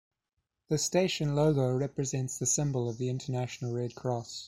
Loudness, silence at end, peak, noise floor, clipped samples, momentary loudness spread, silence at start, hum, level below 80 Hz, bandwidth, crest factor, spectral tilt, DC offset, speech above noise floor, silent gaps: -31 LUFS; 0 s; -14 dBFS; -84 dBFS; under 0.1%; 8 LU; 0.7 s; none; -60 dBFS; 14.5 kHz; 18 dB; -5 dB/octave; under 0.1%; 53 dB; none